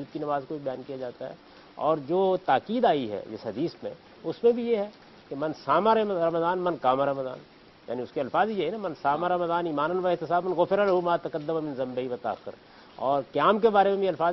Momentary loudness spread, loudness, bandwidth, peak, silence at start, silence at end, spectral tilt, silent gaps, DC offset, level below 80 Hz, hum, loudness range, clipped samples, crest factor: 14 LU; -27 LUFS; 6 kHz; -8 dBFS; 0 s; 0 s; -8 dB/octave; none; under 0.1%; -66 dBFS; none; 2 LU; under 0.1%; 18 dB